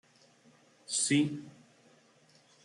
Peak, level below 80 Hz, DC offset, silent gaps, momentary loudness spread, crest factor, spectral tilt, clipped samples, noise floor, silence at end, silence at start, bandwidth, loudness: -18 dBFS; -78 dBFS; under 0.1%; none; 26 LU; 20 dB; -3 dB/octave; under 0.1%; -64 dBFS; 1.15 s; 0.9 s; 11.5 kHz; -30 LUFS